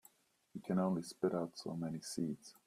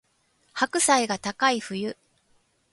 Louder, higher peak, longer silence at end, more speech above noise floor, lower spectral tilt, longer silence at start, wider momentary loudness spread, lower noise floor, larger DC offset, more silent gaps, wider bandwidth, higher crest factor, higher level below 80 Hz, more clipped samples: second, -40 LUFS vs -24 LUFS; second, -22 dBFS vs -8 dBFS; second, 0.15 s vs 0.8 s; second, 30 dB vs 43 dB; first, -6.5 dB/octave vs -2 dB/octave; about the same, 0.55 s vs 0.55 s; second, 7 LU vs 15 LU; about the same, -69 dBFS vs -67 dBFS; neither; neither; first, 14.5 kHz vs 12 kHz; about the same, 18 dB vs 20 dB; second, -78 dBFS vs -68 dBFS; neither